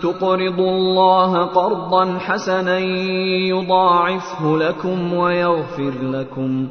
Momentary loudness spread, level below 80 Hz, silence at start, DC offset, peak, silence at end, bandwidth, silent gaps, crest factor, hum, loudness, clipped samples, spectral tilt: 8 LU; -56 dBFS; 0 s; under 0.1%; -2 dBFS; 0 s; 6.6 kHz; none; 16 dB; none; -18 LUFS; under 0.1%; -6.5 dB/octave